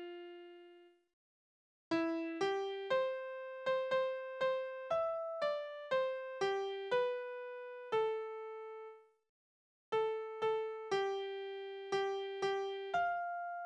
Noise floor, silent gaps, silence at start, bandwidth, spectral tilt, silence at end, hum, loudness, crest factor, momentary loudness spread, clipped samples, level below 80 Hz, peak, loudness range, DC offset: -62 dBFS; 1.13-1.91 s, 9.29-9.92 s; 0 s; 9.8 kHz; -4 dB/octave; 0 s; none; -38 LUFS; 16 dB; 11 LU; under 0.1%; -82 dBFS; -24 dBFS; 3 LU; under 0.1%